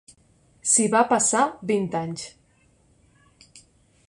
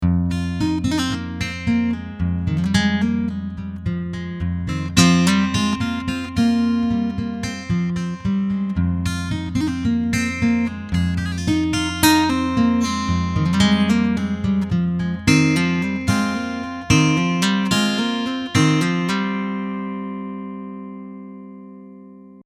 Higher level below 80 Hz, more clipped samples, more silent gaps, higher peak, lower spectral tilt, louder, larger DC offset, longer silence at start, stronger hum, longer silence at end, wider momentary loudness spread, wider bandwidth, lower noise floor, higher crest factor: second, -64 dBFS vs -38 dBFS; neither; neither; second, -6 dBFS vs 0 dBFS; second, -3.5 dB/octave vs -5 dB/octave; about the same, -21 LUFS vs -20 LUFS; neither; first, 0.65 s vs 0 s; neither; first, 1.8 s vs 0.05 s; first, 15 LU vs 12 LU; second, 11.5 kHz vs 15 kHz; first, -61 dBFS vs -42 dBFS; about the same, 20 dB vs 20 dB